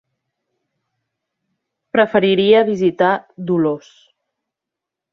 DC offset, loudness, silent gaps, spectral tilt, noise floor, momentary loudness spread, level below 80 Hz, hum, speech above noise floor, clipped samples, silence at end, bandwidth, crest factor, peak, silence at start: under 0.1%; -16 LUFS; none; -7 dB/octave; -84 dBFS; 9 LU; -62 dBFS; none; 68 dB; under 0.1%; 1.35 s; 6.6 kHz; 18 dB; -2 dBFS; 1.95 s